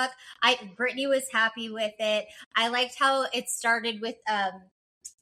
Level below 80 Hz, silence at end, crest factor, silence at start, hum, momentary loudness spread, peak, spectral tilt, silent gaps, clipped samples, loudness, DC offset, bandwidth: -78 dBFS; 0.15 s; 22 dB; 0 s; none; 8 LU; -8 dBFS; -1 dB/octave; 2.46-2.51 s, 4.71-5.01 s; under 0.1%; -27 LUFS; under 0.1%; 15.5 kHz